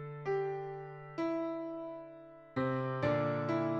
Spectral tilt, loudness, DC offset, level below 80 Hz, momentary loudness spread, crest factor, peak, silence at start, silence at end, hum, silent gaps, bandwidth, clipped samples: -8.5 dB/octave; -37 LUFS; under 0.1%; -70 dBFS; 13 LU; 16 dB; -20 dBFS; 0 s; 0 s; none; none; 7.6 kHz; under 0.1%